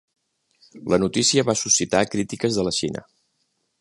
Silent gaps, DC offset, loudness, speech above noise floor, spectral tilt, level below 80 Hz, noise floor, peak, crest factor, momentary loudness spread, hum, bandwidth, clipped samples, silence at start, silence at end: none; under 0.1%; -21 LUFS; 50 dB; -3 dB/octave; -54 dBFS; -72 dBFS; -2 dBFS; 20 dB; 10 LU; none; 11.5 kHz; under 0.1%; 0.75 s; 0.8 s